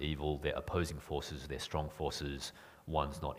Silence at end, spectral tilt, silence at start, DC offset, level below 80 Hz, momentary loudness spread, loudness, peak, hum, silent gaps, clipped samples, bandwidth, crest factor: 0 s; -5 dB/octave; 0 s; under 0.1%; -48 dBFS; 7 LU; -39 LUFS; -16 dBFS; none; none; under 0.1%; 15.5 kHz; 22 dB